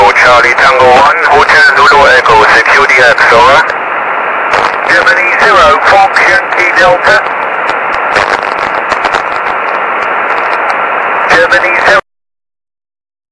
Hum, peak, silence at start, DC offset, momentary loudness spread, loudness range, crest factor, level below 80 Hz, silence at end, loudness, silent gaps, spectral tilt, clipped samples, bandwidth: none; 0 dBFS; 0 s; under 0.1%; 8 LU; 7 LU; 6 dB; -36 dBFS; 1.3 s; -5 LUFS; none; -2.5 dB/octave; 5%; 11 kHz